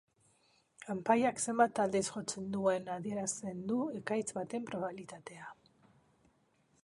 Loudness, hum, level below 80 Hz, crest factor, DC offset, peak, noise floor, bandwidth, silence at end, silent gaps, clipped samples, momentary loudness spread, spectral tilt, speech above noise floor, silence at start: -35 LUFS; none; -74 dBFS; 22 dB; under 0.1%; -14 dBFS; -73 dBFS; 11.5 kHz; 1.3 s; none; under 0.1%; 19 LU; -4.5 dB/octave; 38 dB; 0.8 s